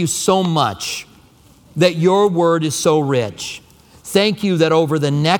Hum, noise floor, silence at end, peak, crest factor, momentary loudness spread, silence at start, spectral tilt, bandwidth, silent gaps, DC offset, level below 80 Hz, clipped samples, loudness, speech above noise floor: none; -48 dBFS; 0 s; 0 dBFS; 16 dB; 14 LU; 0 s; -5 dB/octave; 19 kHz; none; under 0.1%; -56 dBFS; under 0.1%; -16 LUFS; 32 dB